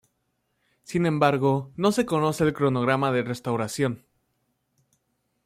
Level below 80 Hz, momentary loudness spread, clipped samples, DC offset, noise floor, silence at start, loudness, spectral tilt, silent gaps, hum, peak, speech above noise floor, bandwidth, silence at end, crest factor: -62 dBFS; 7 LU; under 0.1%; under 0.1%; -75 dBFS; 0.9 s; -24 LUFS; -6 dB/octave; none; none; -6 dBFS; 51 dB; 16 kHz; 1.5 s; 20 dB